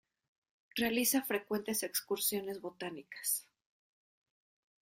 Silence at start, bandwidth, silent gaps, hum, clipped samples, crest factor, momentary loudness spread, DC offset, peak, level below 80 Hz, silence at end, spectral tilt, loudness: 0.75 s; 16 kHz; none; none; under 0.1%; 20 dB; 12 LU; under 0.1%; -18 dBFS; -76 dBFS; 1.4 s; -2 dB/octave; -35 LUFS